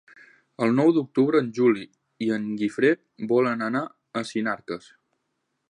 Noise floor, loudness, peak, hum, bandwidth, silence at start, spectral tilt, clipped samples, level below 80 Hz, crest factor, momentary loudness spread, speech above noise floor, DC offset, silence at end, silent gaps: -77 dBFS; -24 LUFS; -8 dBFS; none; 10.5 kHz; 0.6 s; -7 dB/octave; under 0.1%; -74 dBFS; 16 dB; 11 LU; 54 dB; under 0.1%; 0.95 s; none